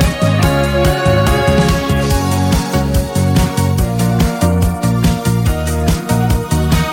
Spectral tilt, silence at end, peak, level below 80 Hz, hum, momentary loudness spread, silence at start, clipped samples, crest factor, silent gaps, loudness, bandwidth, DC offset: -6 dB/octave; 0 s; -2 dBFS; -20 dBFS; none; 3 LU; 0 s; under 0.1%; 12 dB; none; -14 LUFS; 17 kHz; 0.3%